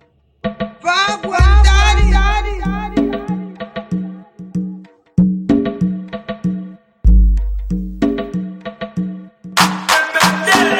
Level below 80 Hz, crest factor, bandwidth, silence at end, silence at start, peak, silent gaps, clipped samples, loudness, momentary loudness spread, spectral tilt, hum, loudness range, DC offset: -18 dBFS; 16 dB; 16 kHz; 0 s; 0.45 s; 0 dBFS; none; under 0.1%; -16 LUFS; 16 LU; -5 dB/octave; none; 5 LU; under 0.1%